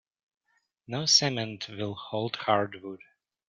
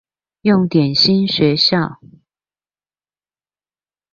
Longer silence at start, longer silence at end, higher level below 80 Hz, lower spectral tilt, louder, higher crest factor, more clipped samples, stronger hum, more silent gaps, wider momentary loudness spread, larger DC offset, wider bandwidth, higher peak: first, 0.9 s vs 0.45 s; second, 0.55 s vs 2.2 s; second, -72 dBFS vs -56 dBFS; second, -3 dB/octave vs -6.5 dB/octave; second, -27 LUFS vs -14 LUFS; first, 24 dB vs 16 dB; neither; second, none vs 50 Hz at -40 dBFS; neither; first, 19 LU vs 8 LU; neither; first, 11.5 kHz vs 7.2 kHz; second, -8 dBFS vs -2 dBFS